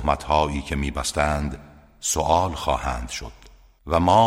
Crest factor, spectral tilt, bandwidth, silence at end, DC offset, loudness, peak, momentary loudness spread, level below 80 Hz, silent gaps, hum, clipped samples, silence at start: 20 dB; -4.5 dB/octave; 16 kHz; 0 s; under 0.1%; -24 LUFS; -4 dBFS; 12 LU; -34 dBFS; none; none; under 0.1%; 0 s